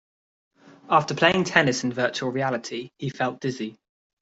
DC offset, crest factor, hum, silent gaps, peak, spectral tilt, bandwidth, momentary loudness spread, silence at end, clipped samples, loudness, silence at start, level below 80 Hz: under 0.1%; 24 dB; none; none; -2 dBFS; -4.5 dB/octave; 8 kHz; 14 LU; 0.5 s; under 0.1%; -24 LUFS; 0.9 s; -64 dBFS